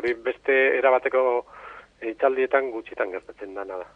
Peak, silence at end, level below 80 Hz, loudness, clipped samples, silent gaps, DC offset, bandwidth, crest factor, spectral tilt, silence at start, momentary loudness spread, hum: -6 dBFS; 0.1 s; -62 dBFS; -23 LUFS; under 0.1%; none; under 0.1%; 5.4 kHz; 18 dB; -5.5 dB/octave; 0 s; 17 LU; none